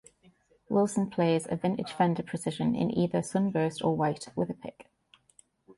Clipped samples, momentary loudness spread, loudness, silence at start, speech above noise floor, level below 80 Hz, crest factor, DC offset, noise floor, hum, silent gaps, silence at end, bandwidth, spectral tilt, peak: under 0.1%; 6 LU; -29 LUFS; 0.7 s; 35 dB; -64 dBFS; 16 dB; under 0.1%; -64 dBFS; none; none; 0.05 s; 11.5 kHz; -6.5 dB/octave; -14 dBFS